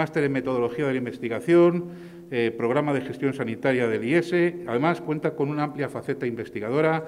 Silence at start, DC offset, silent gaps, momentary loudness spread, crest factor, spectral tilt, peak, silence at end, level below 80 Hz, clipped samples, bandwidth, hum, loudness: 0 s; under 0.1%; none; 9 LU; 16 dB; -7.5 dB/octave; -8 dBFS; 0 s; -66 dBFS; under 0.1%; 11 kHz; none; -25 LUFS